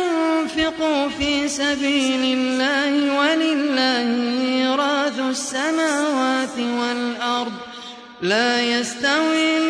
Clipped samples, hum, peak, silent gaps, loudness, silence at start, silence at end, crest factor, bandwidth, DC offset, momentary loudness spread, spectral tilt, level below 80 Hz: under 0.1%; none; -4 dBFS; none; -20 LUFS; 0 s; 0 s; 16 dB; 11 kHz; under 0.1%; 5 LU; -2.5 dB/octave; -54 dBFS